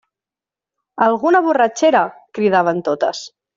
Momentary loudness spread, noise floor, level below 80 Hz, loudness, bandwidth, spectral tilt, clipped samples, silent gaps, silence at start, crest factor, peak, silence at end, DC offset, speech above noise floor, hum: 9 LU; -89 dBFS; -66 dBFS; -16 LUFS; 7.8 kHz; -3.5 dB/octave; under 0.1%; none; 0.95 s; 14 dB; -2 dBFS; 0.3 s; under 0.1%; 73 dB; none